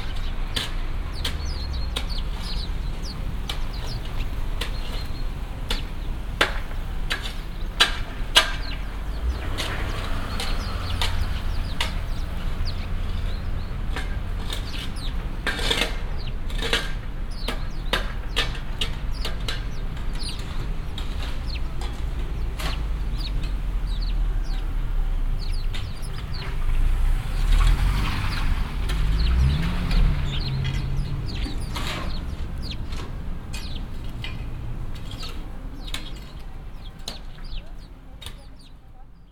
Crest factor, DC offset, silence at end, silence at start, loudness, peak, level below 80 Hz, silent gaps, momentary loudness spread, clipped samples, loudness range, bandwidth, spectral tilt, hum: 24 dB; under 0.1%; 0 s; 0 s; -28 LUFS; 0 dBFS; -26 dBFS; none; 11 LU; under 0.1%; 10 LU; 16 kHz; -4 dB/octave; none